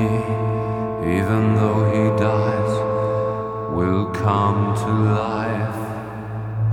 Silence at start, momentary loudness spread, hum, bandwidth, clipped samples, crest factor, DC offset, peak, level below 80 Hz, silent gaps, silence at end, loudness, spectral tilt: 0 s; 8 LU; none; 10.5 kHz; under 0.1%; 16 dB; under 0.1%; -4 dBFS; -46 dBFS; none; 0 s; -21 LUFS; -8.5 dB/octave